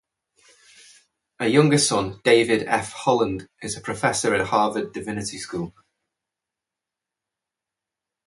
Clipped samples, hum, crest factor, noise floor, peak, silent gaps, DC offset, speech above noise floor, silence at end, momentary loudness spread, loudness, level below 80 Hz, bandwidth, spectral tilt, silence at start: under 0.1%; none; 24 dB; -87 dBFS; -2 dBFS; none; under 0.1%; 65 dB; 2.55 s; 13 LU; -22 LUFS; -56 dBFS; 11.5 kHz; -4 dB/octave; 1.4 s